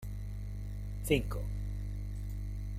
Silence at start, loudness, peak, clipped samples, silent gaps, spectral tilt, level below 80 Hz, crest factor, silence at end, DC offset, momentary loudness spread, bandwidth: 0 s; -38 LUFS; -14 dBFS; under 0.1%; none; -6 dB/octave; -40 dBFS; 22 dB; 0 s; under 0.1%; 10 LU; 15.5 kHz